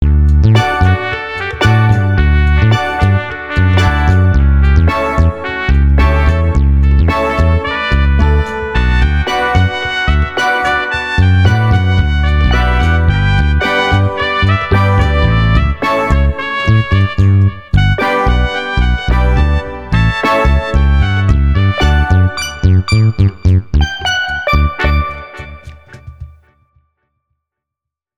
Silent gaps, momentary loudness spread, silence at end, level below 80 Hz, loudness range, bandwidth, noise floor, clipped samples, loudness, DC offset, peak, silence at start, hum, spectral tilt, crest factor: none; 5 LU; 1.9 s; -14 dBFS; 2 LU; 10 kHz; -82 dBFS; under 0.1%; -12 LUFS; under 0.1%; 0 dBFS; 0 s; none; -6.5 dB/octave; 10 dB